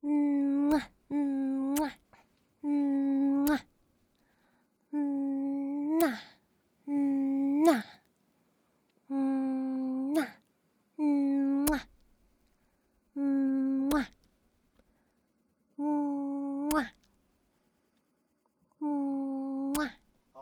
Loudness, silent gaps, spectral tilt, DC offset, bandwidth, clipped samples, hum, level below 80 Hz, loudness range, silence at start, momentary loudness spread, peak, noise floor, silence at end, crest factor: -31 LUFS; none; -4.5 dB/octave; under 0.1%; over 20 kHz; under 0.1%; none; -60 dBFS; 5 LU; 0.05 s; 10 LU; -10 dBFS; -75 dBFS; 0 s; 22 dB